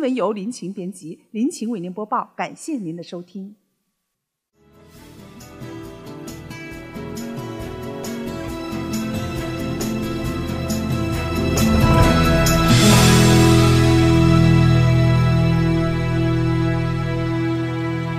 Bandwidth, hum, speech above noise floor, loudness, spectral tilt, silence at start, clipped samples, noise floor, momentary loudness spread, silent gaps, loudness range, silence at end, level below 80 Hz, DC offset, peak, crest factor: 16 kHz; none; 53 dB; -18 LUFS; -5.5 dB/octave; 0 s; under 0.1%; -79 dBFS; 20 LU; none; 21 LU; 0 s; -30 dBFS; under 0.1%; 0 dBFS; 18 dB